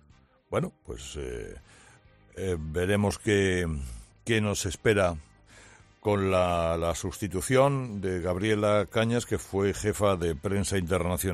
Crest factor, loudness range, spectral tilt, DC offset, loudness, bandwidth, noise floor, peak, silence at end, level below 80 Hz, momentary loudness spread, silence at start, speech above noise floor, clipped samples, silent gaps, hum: 18 dB; 4 LU; -5.5 dB/octave; under 0.1%; -28 LUFS; 14.5 kHz; -60 dBFS; -10 dBFS; 0 s; -48 dBFS; 13 LU; 0.5 s; 33 dB; under 0.1%; none; none